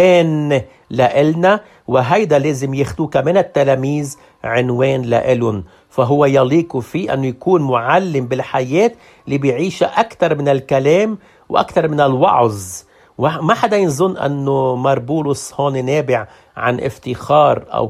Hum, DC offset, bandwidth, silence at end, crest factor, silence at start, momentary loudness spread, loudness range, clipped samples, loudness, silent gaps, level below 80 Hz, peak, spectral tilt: none; under 0.1%; 14.5 kHz; 0 s; 14 dB; 0 s; 8 LU; 2 LU; under 0.1%; -15 LUFS; none; -50 dBFS; 0 dBFS; -6.5 dB/octave